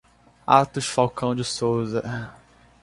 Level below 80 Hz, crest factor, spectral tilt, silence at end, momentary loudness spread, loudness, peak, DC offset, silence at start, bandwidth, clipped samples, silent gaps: -56 dBFS; 24 dB; -5 dB/octave; 0.5 s; 15 LU; -23 LUFS; -2 dBFS; under 0.1%; 0.5 s; 11.5 kHz; under 0.1%; none